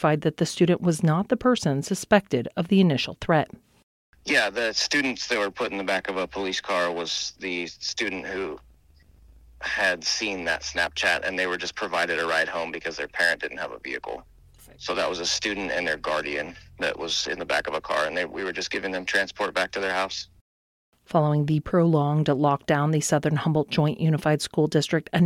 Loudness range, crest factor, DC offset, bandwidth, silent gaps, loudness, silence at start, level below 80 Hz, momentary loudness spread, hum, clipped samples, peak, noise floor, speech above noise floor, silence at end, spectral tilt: 5 LU; 20 dB; under 0.1%; 14 kHz; 3.83-4.13 s, 20.41-20.92 s; -25 LUFS; 0 s; -56 dBFS; 9 LU; none; under 0.1%; -6 dBFS; -56 dBFS; 31 dB; 0 s; -4.5 dB/octave